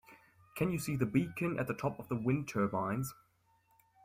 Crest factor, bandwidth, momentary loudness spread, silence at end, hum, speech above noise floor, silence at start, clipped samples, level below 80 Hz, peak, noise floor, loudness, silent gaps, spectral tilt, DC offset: 20 dB; 16 kHz; 5 LU; 0.9 s; none; 37 dB; 0.1 s; under 0.1%; -64 dBFS; -16 dBFS; -72 dBFS; -35 LUFS; none; -7 dB/octave; under 0.1%